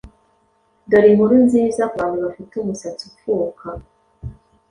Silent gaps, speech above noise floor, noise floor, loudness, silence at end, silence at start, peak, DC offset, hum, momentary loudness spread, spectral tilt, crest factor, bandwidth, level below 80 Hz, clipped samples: none; 44 dB; -61 dBFS; -17 LUFS; 0.4 s; 0.05 s; -2 dBFS; under 0.1%; none; 24 LU; -7 dB/octave; 16 dB; 10.5 kHz; -48 dBFS; under 0.1%